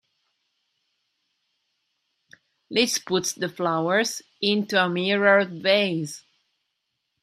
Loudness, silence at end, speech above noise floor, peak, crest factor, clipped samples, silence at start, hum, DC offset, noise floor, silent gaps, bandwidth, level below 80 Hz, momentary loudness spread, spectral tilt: -23 LUFS; 1.05 s; 55 dB; -4 dBFS; 22 dB; under 0.1%; 2.7 s; none; under 0.1%; -78 dBFS; none; 15.5 kHz; -72 dBFS; 9 LU; -3.5 dB/octave